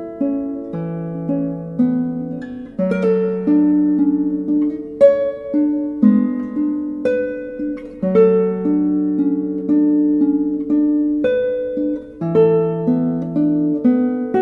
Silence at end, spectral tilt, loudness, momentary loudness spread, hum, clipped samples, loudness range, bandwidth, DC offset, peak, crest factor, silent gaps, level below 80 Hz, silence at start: 0 s; -10.5 dB/octave; -18 LUFS; 11 LU; none; under 0.1%; 2 LU; 4.1 kHz; under 0.1%; 0 dBFS; 16 dB; none; -52 dBFS; 0 s